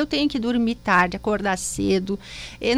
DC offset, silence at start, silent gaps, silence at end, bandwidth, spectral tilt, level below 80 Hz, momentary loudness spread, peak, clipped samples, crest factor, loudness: under 0.1%; 0 s; none; 0 s; 15 kHz; -4 dB/octave; -44 dBFS; 10 LU; -6 dBFS; under 0.1%; 16 dB; -22 LUFS